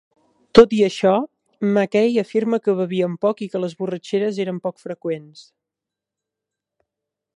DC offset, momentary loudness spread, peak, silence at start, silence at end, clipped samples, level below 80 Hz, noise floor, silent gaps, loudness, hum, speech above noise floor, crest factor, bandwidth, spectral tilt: under 0.1%; 14 LU; 0 dBFS; 0.55 s; 1.95 s; under 0.1%; -52 dBFS; -86 dBFS; none; -19 LUFS; none; 67 dB; 20 dB; 10.5 kHz; -6.5 dB/octave